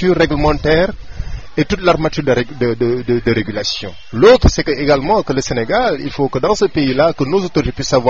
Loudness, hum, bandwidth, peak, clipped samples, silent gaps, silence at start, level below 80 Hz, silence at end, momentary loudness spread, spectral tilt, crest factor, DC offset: -15 LUFS; none; 7.8 kHz; 0 dBFS; under 0.1%; none; 0 s; -28 dBFS; 0 s; 8 LU; -5.5 dB/octave; 14 dB; 2%